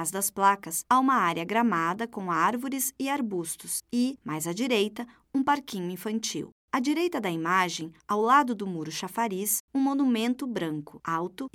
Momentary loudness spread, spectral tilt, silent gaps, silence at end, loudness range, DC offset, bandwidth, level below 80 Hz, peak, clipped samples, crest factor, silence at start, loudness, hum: 10 LU; -3.5 dB/octave; 6.52-6.68 s, 9.60-9.68 s; 0.05 s; 3 LU; under 0.1%; 17 kHz; -72 dBFS; -8 dBFS; under 0.1%; 20 dB; 0 s; -27 LUFS; none